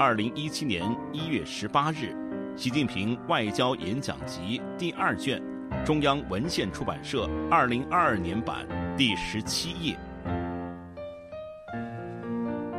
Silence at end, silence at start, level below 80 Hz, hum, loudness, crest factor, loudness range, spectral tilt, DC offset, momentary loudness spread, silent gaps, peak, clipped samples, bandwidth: 0 s; 0 s; -50 dBFS; none; -29 LUFS; 20 dB; 4 LU; -5 dB/octave; under 0.1%; 12 LU; none; -8 dBFS; under 0.1%; 13.5 kHz